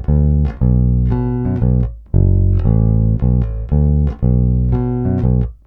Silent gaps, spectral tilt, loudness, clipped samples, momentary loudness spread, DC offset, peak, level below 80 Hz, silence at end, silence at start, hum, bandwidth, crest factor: none; -13 dB/octave; -16 LUFS; under 0.1%; 4 LU; under 0.1%; 0 dBFS; -18 dBFS; 0.1 s; 0 s; none; 2.9 kHz; 12 dB